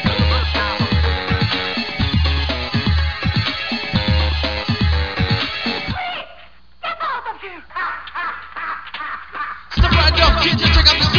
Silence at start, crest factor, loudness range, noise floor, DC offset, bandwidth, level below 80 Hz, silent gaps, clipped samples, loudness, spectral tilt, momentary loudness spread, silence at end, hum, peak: 0 s; 18 dB; 8 LU; -46 dBFS; 0.8%; 5.4 kHz; -24 dBFS; none; under 0.1%; -18 LUFS; -5.5 dB/octave; 14 LU; 0 s; none; 0 dBFS